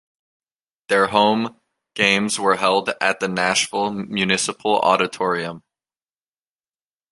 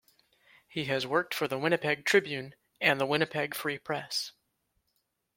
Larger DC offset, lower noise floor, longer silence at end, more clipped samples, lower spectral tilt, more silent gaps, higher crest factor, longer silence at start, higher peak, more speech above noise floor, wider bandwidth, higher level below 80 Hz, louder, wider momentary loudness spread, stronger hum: neither; first, under -90 dBFS vs -78 dBFS; first, 1.55 s vs 1.05 s; neither; about the same, -3 dB/octave vs -4 dB/octave; neither; about the same, 20 dB vs 24 dB; first, 0.9 s vs 0.7 s; first, -2 dBFS vs -8 dBFS; first, over 71 dB vs 48 dB; second, 11.5 kHz vs 16.5 kHz; first, -62 dBFS vs -74 dBFS; first, -19 LUFS vs -30 LUFS; second, 7 LU vs 12 LU; neither